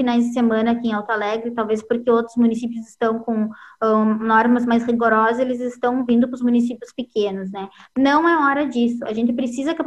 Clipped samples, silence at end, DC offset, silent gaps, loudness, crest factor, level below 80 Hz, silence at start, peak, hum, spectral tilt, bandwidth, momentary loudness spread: under 0.1%; 0 s; under 0.1%; none; -19 LUFS; 16 dB; -60 dBFS; 0 s; -4 dBFS; none; -6 dB/octave; 8.8 kHz; 9 LU